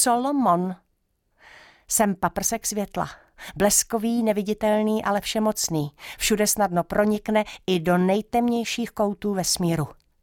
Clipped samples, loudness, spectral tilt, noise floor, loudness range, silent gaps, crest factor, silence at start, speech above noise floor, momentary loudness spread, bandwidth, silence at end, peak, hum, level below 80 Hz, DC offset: under 0.1%; -23 LUFS; -4 dB/octave; -71 dBFS; 2 LU; none; 18 dB; 0 s; 48 dB; 8 LU; 19 kHz; 0.3 s; -6 dBFS; none; -50 dBFS; under 0.1%